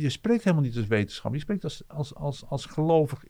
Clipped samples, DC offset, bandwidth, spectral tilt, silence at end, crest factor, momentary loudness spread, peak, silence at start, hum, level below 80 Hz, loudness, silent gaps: under 0.1%; under 0.1%; 13 kHz; -7 dB/octave; 0.05 s; 18 dB; 11 LU; -10 dBFS; 0 s; none; -52 dBFS; -28 LUFS; none